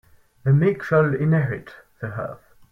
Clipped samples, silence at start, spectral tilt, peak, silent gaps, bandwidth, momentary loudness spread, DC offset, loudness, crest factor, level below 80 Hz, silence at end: under 0.1%; 0.45 s; -10 dB/octave; -6 dBFS; none; 5.8 kHz; 15 LU; under 0.1%; -21 LUFS; 16 dB; -56 dBFS; 0.35 s